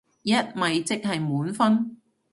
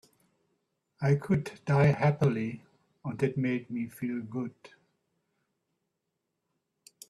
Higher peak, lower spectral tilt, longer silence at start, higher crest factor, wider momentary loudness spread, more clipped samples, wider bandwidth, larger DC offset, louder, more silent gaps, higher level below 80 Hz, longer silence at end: first, -8 dBFS vs -12 dBFS; second, -5 dB/octave vs -8 dB/octave; second, 0.25 s vs 1 s; about the same, 18 dB vs 20 dB; second, 5 LU vs 14 LU; neither; about the same, 11.5 kHz vs 12.5 kHz; neither; first, -25 LUFS vs -30 LUFS; neither; about the same, -68 dBFS vs -66 dBFS; second, 0.4 s vs 2.45 s